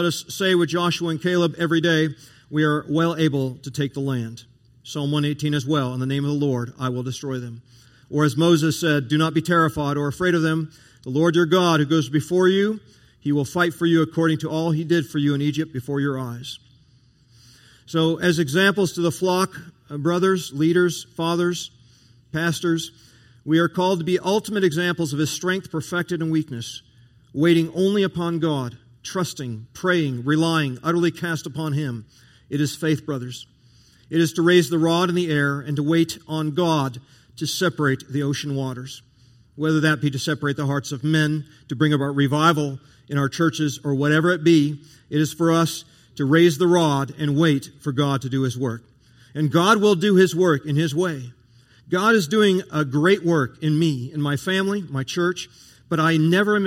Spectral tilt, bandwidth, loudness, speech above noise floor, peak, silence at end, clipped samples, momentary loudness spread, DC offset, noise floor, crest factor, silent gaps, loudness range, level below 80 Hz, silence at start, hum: -5.5 dB/octave; 16 kHz; -21 LUFS; 35 dB; -2 dBFS; 0 s; under 0.1%; 12 LU; under 0.1%; -56 dBFS; 18 dB; none; 5 LU; -60 dBFS; 0 s; none